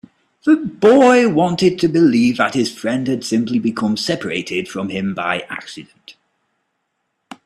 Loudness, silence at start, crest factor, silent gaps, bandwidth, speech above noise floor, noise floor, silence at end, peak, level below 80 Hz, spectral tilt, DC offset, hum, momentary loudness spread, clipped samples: -16 LUFS; 0.45 s; 16 dB; none; 13 kHz; 56 dB; -72 dBFS; 1.35 s; 0 dBFS; -56 dBFS; -5.5 dB/octave; under 0.1%; none; 12 LU; under 0.1%